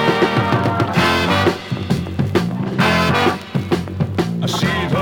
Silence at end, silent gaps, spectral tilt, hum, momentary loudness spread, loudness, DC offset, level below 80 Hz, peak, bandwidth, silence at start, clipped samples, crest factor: 0 s; none; -6 dB/octave; none; 6 LU; -17 LUFS; under 0.1%; -46 dBFS; -2 dBFS; 19 kHz; 0 s; under 0.1%; 16 dB